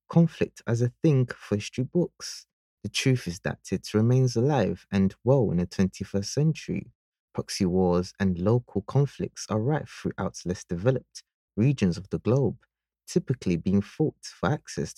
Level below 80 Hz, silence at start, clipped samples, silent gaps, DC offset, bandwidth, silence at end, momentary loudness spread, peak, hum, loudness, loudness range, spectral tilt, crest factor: -56 dBFS; 0.1 s; under 0.1%; 2.53-2.77 s, 6.95-7.12 s, 7.20-7.28 s, 11.34-11.48 s; under 0.1%; 12.5 kHz; 0.05 s; 11 LU; -8 dBFS; none; -27 LUFS; 3 LU; -6.5 dB/octave; 20 dB